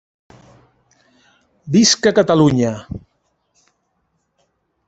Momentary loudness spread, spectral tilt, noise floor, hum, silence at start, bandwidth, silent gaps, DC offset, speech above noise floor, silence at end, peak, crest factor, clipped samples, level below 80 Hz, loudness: 20 LU; -4.5 dB/octave; -68 dBFS; none; 1.65 s; 8.4 kHz; none; under 0.1%; 54 dB; 1.9 s; 0 dBFS; 18 dB; under 0.1%; -52 dBFS; -14 LUFS